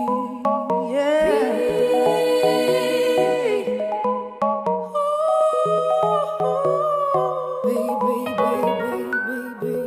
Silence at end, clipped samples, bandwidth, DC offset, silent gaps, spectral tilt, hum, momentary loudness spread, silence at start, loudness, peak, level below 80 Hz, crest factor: 0 s; under 0.1%; 15.5 kHz; under 0.1%; none; -5 dB/octave; none; 6 LU; 0 s; -21 LUFS; -6 dBFS; -60 dBFS; 14 dB